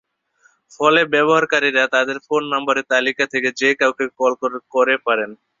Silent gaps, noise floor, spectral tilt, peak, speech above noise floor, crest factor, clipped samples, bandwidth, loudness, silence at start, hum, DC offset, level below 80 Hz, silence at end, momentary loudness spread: none; -59 dBFS; -3.5 dB/octave; -2 dBFS; 41 dB; 18 dB; under 0.1%; 7.6 kHz; -17 LUFS; 0.8 s; none; under 0.1%; -66 dBFS; 0.25 s; 6 LU